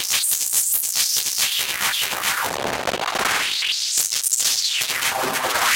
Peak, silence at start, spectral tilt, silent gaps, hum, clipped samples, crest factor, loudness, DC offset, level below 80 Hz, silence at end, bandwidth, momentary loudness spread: -2 dBFS; 0 s; 1 dB/octave; none; none; under 0.1%; 20 dB; -19 LUFS; under 0.1%; -56 dBFS; 0 s; 17.5 kHz; 5 LU